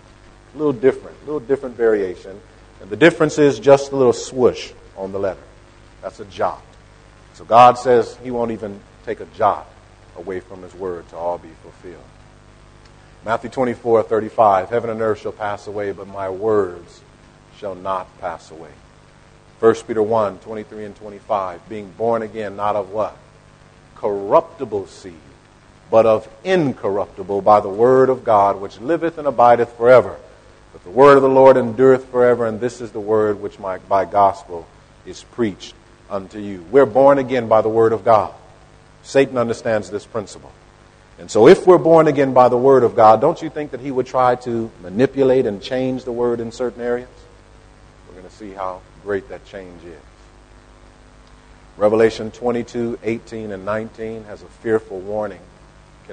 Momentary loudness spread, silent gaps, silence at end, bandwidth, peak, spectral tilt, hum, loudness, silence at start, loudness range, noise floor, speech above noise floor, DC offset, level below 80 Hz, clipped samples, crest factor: 20 LU; none; 0 s; 9.6 kHz; 0 dBFS; -6.5 dB/octave; 50 Hz at -50 dBFS; -17 LUFS; 0.55 s; 12 LU; -47 dBFS; 31 dB; under 0.1%; -50 dBFS; under 0.1%; 18 dB